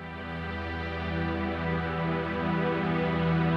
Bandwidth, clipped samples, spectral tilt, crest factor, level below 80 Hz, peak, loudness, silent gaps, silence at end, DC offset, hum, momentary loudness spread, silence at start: 5.8 kHz; under 0.1%; -8.5 dB/octave; 14 dB; -44 dBFS; -16 dBFS; -30 LUFS; none; 0 s; under 0.1%; none; 7 LU; 0 s